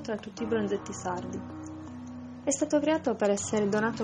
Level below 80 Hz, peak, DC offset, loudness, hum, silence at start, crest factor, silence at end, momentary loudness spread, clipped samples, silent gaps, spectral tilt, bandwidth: -66 dBFS; -14 dBFS; under 0.1%; -30 LUFS; none; 0 s; 16 dB; 0 s; 15 LU; under 0.1%; none; -4.5 dB/octave; 9.6 kHz